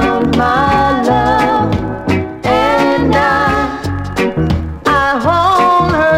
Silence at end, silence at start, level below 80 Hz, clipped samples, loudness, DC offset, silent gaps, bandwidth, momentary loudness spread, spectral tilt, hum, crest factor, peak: 0 s; 0 s; -28 dBFS; under 0.1%; -12 LUFS; under 0.1%; none; 16.5 kHz; 6 LU; -6.5 dB/octave; none; 12 dB; 0 dBFS